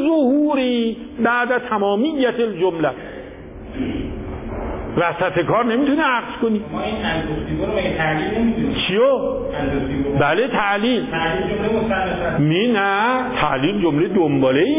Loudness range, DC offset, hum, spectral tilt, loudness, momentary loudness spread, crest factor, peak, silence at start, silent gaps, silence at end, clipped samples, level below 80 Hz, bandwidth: 4 LU; under 0.1%; none; -10 dB/octave; -19 LUFS; 9 LU; 14 dB; -4 dBFS; 0 s; none; 0 s; under 0.1%; -38 dBFS; 3.9 kHz